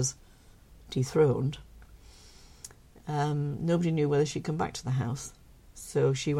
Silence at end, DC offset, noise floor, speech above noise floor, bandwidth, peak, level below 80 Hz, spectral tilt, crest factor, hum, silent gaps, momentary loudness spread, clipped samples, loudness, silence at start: 0 s; under 0.1%; -55 dBFS; 27 dB; 13.5 kHz; -12 dBFS; -54 dBFS; -6 dB/octave; 18 dB; none; none; 21 LU; under 0.1%; -29 LUFS; 0 s